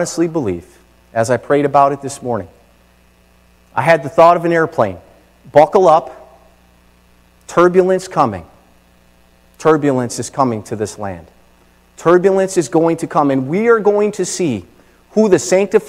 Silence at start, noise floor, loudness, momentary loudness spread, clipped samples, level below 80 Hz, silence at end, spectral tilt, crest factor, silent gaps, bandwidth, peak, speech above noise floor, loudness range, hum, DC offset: 0 s; -50 dBFS; -14 LUFS; 13 LU; 0.3%; -52 dBFS; 0 s; -5.5 dB/octave; 16 dB; none; 15 kHz; 0 dBFS; 37 dB; 5 LU; 60 Hz at -50 dBFS; under 0.1%